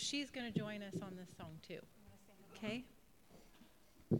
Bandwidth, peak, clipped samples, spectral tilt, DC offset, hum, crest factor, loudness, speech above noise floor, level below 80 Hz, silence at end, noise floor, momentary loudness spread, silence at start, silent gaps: 18 kHz; -24 dBFS; under 0.1%; -4.5 dB/octave; under 0.1%; none; 22 dB; -47 LUFS; 20 dB; -74 dBFS; 0 s; -67 dBFS; 23 LU; 0 s; none